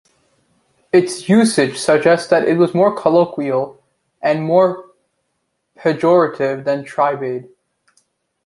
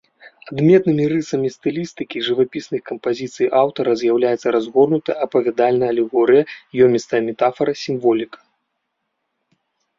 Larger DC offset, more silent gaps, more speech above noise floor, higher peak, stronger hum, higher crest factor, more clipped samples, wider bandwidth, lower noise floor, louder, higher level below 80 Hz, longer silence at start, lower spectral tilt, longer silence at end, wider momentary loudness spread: neither; neither; about the same, 56 dB vs 57 dB; about the same, -2 dBFS vs -2 dBFS; neither; about the same, 16 dB vs 16 dB; neither; first, 11.5 kHz vs 7.6 kHz; about the same, -71 dBFS vs -74 dBFS; about the same, -16 LUFS vs -18 LUFS; about the same, -62 dBFS vs -60 dBFS; first, 0.95 s vs 0.25 s; about the same, -5.5 dB/octave vs -6.5 dB/octave; second, 1.05 s vs 1.75 s; about the same, 8 LU vs 10 LU